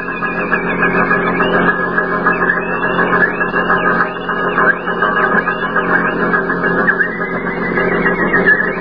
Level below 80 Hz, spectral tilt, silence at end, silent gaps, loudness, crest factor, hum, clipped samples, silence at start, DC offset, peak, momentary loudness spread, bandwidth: -42 dBFS; -9 dB/octave; 0 s; none; -14 LUFS; 14 dB; none; under 0.1%; 0 s; 1%; 0 dBFS; 4 LU; 5.2 kHz